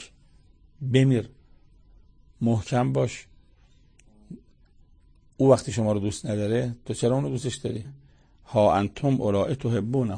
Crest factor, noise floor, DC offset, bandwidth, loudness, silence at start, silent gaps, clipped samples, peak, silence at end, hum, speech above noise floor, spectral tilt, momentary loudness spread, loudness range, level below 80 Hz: 20 dB; -57 dBFS; under 0.1%; 9.8 kHz; -25 LUFS; 0 s; none; under 0.1%; -6 dBFS; 0 s; none; 33 dB; -7 dB/octave; 17 LU; 5 LU; -54 dBFS